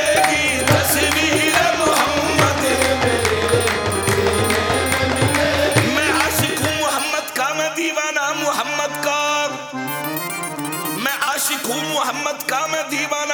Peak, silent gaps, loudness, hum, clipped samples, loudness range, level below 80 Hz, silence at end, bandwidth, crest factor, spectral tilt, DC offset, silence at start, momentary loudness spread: -2 dBFS; none; -18 LUFS; none; under 0.1%; 5 LU; -42 dBFS; 0 s; 19.5 kHz; 18 dB; -3 dB/octave; under 0.1%; 0 s; 7 LU